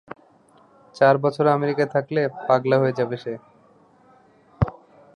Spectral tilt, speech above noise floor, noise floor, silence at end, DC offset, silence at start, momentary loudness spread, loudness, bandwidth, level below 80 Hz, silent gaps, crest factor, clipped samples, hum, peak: -8 dB/octave; 35 dB; -55 dBFS; 0.45 s; under 0.1%; 0.1 s; 15 LU; -21 LUFS; 11 kHz; -46 dBFS; none; 20 dB; under 0.1%; none; -4 dBFS